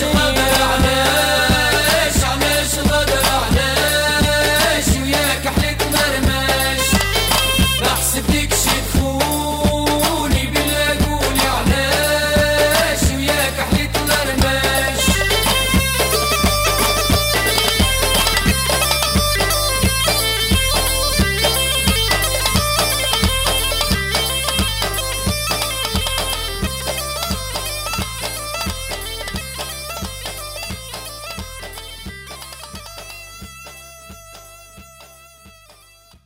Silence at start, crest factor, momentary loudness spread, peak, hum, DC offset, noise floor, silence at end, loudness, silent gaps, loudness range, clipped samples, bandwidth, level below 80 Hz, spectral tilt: 0 s; 12 dB; 13 LU; -6 dBFS; none; under 0.1%; -48 dBFS; 0.75 s; -16 LUFS; none; 13 LU; under 0.1%; 16.5 kHz; -26 dBFS; -3 dB/octave